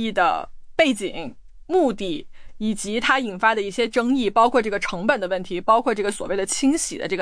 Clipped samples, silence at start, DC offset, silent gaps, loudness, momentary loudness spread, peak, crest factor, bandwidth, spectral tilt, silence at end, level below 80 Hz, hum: under 0.1%; 0 s; under 0.1%; none; -22 LUFS; 10 LU; -4 dBFS; 16 dB; 10.5 kHz; -3.5 dB/octave; 0 s; -46 dBFS; none